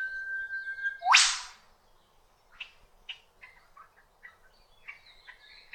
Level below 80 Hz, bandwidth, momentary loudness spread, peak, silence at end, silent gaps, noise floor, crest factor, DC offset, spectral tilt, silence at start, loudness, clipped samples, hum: -66 dBFS; 18 kHz; 29 LU; -6 dBFS; 0.2 s; none; -64 dBFS; 28 dB; under 0.1%; 4.5 dB/octave; 0 s; -26 LUFS; under 0.1%; none